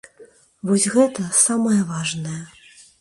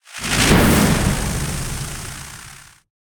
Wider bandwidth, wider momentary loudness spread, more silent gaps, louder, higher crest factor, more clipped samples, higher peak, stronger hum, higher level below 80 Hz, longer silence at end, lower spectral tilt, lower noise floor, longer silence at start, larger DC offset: second, 11.5 kHz vs 19.5 kHz; second, 15 LU vs 20 LU; neither; about the same, -19 LUFS vs -17 LUFS; about the same, 18 dB vs 18 dB; neither; about the same, -2 dBFS vs -2 dBFS; neither; second, -62 dBFS vs -28 dBFS; first, 0.55 s vs 0.4 s; about the same, -4 dB/octave vs -4 dB/octave; first, -49 dBFS vs -41 dBFS; about the same, 0.2 s vs 0.1 s; neither